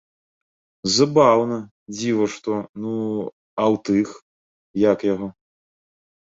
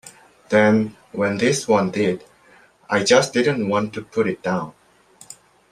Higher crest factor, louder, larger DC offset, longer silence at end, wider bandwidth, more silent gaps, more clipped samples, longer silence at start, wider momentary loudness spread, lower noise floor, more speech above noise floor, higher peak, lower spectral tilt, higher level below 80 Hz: about the same, 20 dB vs 20 dB; about the same, -21 LUFS vs -20 LUFS; neither; first, 0.9 s vs 0.4 s; second, 8 kHz vs 13 kHz; first, 1.71-1.86 s, 2.69-2.74 s, 3.32-3.57 s, 4.22-4.74 s vs none; neither; first, 0.85 s vs 0.05 s; first, 14 LU vs 10 LU; first, under -90 dBFS vs -52 dBFS; first, over 70 dB vs 34 dB; about the same, -2 dBFS vs -2 dBFS; about the same, -5 dB/octave vs -4.5 dB/octave; about the same, -60 dBFS vs -60 dBFS